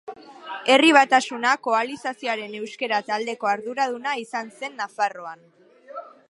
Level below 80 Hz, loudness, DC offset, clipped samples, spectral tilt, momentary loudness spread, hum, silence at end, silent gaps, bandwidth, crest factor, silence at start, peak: -82 dBFS; -22 LUFS; under 0.1%; under 0.1%; -2 dB/octave; 23 LU; none; 0.2 s; none; 11.5 kHz; 22 dB; 0.05 s; -2 dBFS